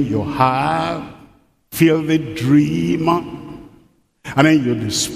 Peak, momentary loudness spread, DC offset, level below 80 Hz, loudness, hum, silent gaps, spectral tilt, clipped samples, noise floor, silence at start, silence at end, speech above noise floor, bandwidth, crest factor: 0 dBFS; 18 LU; under 0.1%; -48 dBFS; -17 LUFS; none; none; -5.5 dB/octave; under 0.1%; -53 dBFS; 0 s; 0 s; 37 dB; 15.5 kHz; 18 dB